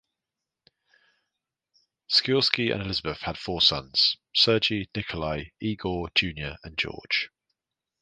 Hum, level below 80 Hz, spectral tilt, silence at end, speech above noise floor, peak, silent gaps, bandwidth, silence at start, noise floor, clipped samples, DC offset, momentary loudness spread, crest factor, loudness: none; -50 dBFS; -4.5 dB/octave; 0.75 s; 61 dB; -2 dBFS; none; 9.8 kHz; 2.1 s; -87 dBFS; under 0.1%; under 0.1%; 12 LU; 26 dB; -25 LUFS